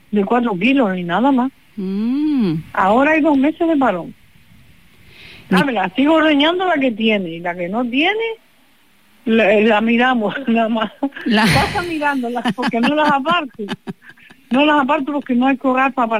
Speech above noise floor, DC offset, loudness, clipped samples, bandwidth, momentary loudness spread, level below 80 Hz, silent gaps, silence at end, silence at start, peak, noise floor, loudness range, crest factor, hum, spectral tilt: 39 dB; 0.4%; -16 LUFS; under 0.1%; 15.5 kHz; 10 LU; -50 dBFS; none; 0 s; 0.1 s; -4 dBFS; -55 dBFS; 2 LU; 12 dB; none; -6 dB/octave